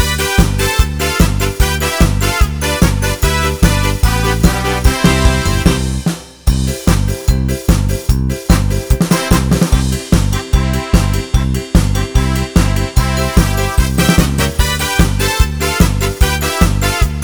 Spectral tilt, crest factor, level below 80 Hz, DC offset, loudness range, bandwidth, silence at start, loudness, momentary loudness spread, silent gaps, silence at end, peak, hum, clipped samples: -5 dB/octave; 12 dB; -16 dBFS; 0.4%; 1 LU; over 20 kHz; 0 s; -14 LUFS; 3 LU; none; 0 s; 0 dBFS; none; 0.6%